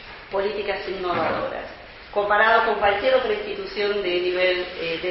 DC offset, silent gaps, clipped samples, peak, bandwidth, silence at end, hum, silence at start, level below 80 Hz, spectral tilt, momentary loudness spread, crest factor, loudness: under 0.1%; none; under 0.1%; -4 dBFS; 5.8 kHz; 0 s; none; 0 s; -50 dBFS; -1 dB/octave; 12 LU; 18 dB; -22 LUFS